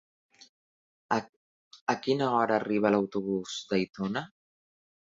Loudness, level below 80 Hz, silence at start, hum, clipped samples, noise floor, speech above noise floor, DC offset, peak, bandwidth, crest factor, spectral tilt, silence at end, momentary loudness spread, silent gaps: -29 LUFS; -70 dBFS; 1.1 s; none; under 0.1%; under -90 dBFS; over 62 dB; under 0.1%; -10 dBFS; 7.8 kHz; 22 dB; -5.5 dB/octave; 0.8 s; 8 LU; 1.29-1.71 s, 1.81-1.87 s, 3.89-3.93 s